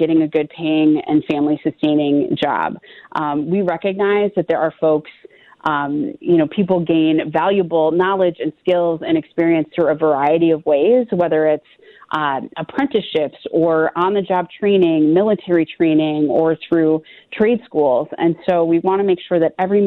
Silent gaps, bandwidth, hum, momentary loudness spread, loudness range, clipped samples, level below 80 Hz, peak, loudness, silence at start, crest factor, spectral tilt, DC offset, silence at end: none; 4.2 kHz; none; 6 LU; 3 LU; under 0.1%; -60 dBFS; -4 dBFS; -17 LUFS; 0 s; 12 dB; -9 dB/octave; under 0.1%; 0 s